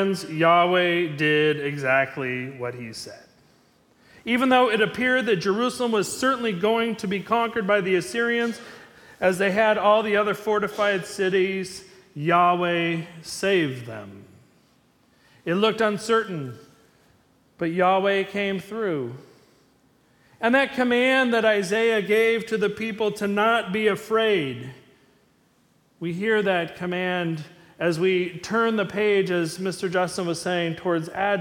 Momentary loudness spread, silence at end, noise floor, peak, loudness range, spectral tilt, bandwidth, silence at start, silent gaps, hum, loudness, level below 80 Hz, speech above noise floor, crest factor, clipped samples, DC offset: 13 LU; 0 s; -62 dBFS; -6 dBFS; 5 LU; -5 dB/octave; 18 kHz; 0 s; none; none; -23 LUFS; -66 dBFS; 39 dB; 18 dB; under 0.1%; under 0.1%